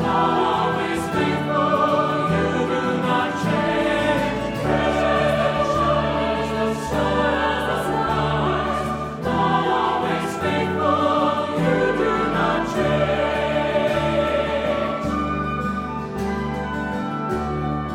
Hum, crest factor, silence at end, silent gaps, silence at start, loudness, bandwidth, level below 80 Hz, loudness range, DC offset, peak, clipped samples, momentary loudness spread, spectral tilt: none; 14 dB; 0 s; none; 0 s; -21 LUFS; 16 kHz; -38 dBFS; 2 LU; under 0.1%; -6 dBFS; under 0.1%; 6 LU; -6 dB/octave